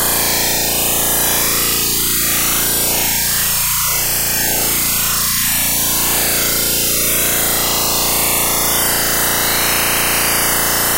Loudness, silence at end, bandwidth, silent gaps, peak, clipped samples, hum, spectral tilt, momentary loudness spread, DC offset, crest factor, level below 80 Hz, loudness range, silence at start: -12 LUFS; 0 s; 16.5 kHz; none; -2 dBFS; under 0.1%; none; -1 dB/octave; 1 LU; under 0.1%; 12 dB; -36 dBFS; 0 LU; 0 s